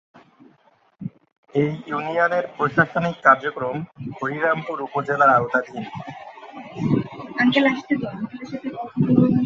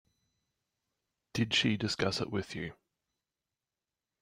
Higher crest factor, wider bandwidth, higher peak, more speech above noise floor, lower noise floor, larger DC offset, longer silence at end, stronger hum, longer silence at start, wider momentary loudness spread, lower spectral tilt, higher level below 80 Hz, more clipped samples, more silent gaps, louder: about the same, 22 dB vs 22 dB; second, 7.2 kHz vs 16 kHz; first, 0 dBFS vs -14 dBFS; second, 38 dB vs over 57 dB; second, -59 dBFS vs under -90 dBFS; neither; second, 0 s vs 1.5 s; neither; second, 1 s vs 1.35 s; first, 19 LU vs 13 LU; first, -7.5 dB/octave vs -4.5 dB/octave; first, -58 dBFS vs -66 dBFS; neither; first, 1.32-1.43 s vs none; first, -21 LUFS vs -32 LUFS